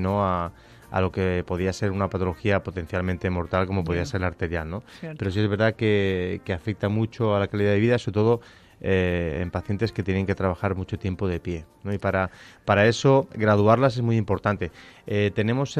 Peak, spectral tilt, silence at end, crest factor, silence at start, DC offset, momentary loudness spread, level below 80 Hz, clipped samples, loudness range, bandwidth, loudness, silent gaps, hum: -6 dBFS; -7 dB/octave; 0 s; 18 dB; 0 s; under 0.1%; 10 LU; -50 dBFS; under 0.1%; 5 LU; 9.6 kHz; -24 LUFS; none; none